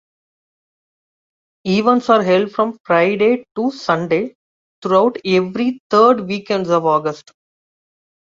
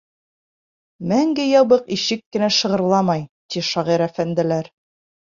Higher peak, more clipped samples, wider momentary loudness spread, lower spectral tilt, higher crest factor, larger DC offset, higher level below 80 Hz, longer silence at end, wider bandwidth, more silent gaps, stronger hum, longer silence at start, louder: about the same, -2 dBFS vs -2 dBFS; neither; about the same, 8 LU vs 10 LU; first, -6.5 dB/octave vs -5 dB/octave; about the same, 16 dB vs 18 dB; neither; about the same, -62 dBFS vs -62 dBFS; first, 1.1 s vs 0.7 s; about the same, 7.6 kHz vs 7.4 kHz; first, 2.80-2.84 s, 4.35-4.82 s, 5.80-5.90 s vs 2.26-2.31 s, 3.29-3.49 s; neither; first, 1.65 s vs 1 s; first, -16 LUFS vs -19 LUFS